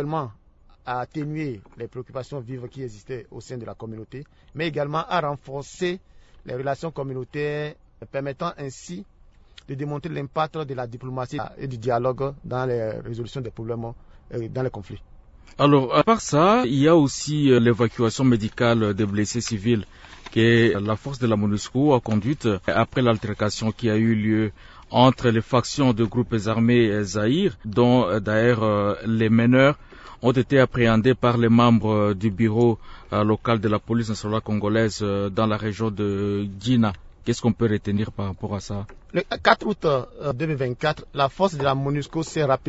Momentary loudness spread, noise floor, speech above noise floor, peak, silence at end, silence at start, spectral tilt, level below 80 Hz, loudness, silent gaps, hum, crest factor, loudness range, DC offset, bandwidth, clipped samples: 16 LU; -50 dBFS; 28 dB; -2 dBFS; 0 s; 0 s; -6.5 dB/octave; -48 dBFS; -22 LUFS; none; none; 20 dB; 11 LU; under 0.1%; 8 kHz; under 0.1%